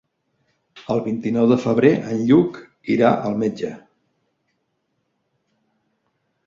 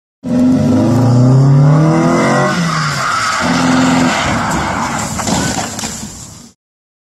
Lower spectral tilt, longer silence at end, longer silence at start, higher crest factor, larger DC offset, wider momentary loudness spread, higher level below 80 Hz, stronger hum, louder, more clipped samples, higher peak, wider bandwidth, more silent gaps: first, -8 dB/octave vs -5.5 dB/octave; first, 2.7 s vs 0.65 s; first, 0.75 s vs 0.25 s; first, 20 dB vs 12 dB; neither; about the same, 13 LU vs 11 LU; second, -60 dBFS vs -38 dBFS; neither; second, -19 LUFS vs -12 LUFS; neither; about the same, -2 dBFS vs 0 dBFS; second, 7.4 kHz vs 13 kHz; neither